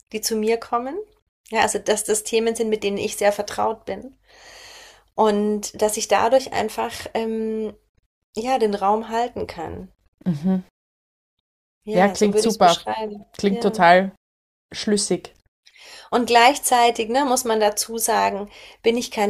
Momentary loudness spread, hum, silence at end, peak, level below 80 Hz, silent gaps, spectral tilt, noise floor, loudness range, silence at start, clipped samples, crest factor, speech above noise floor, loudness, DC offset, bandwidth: 15 LU; none; 0 s; -2 dBFS; -56 dBFS; 1.22-1.44 s, 7.89-7.95 s, 8.06-8.33 s, 10.08-10.18 s, 10.70-11.81 s, 14.17-14.69 s, 15.48-15.63 s; -3.5 dB/octave; -46 dBFS; 6 LU; 0.15 s; under 0.1%; 20 dB; 26 dB; -21 LUFS; under 0.1%; 15.5 kHz